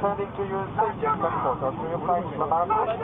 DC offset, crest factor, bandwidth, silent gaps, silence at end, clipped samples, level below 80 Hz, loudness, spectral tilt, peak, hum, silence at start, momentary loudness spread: under 0.1%; 16 dB; 3.9 kHz; none; 0 s; under 0.1%; -50 dBFS; -26 LUFS; -10 dB/octave; -10 dBFS; none; 0 s; 6 LU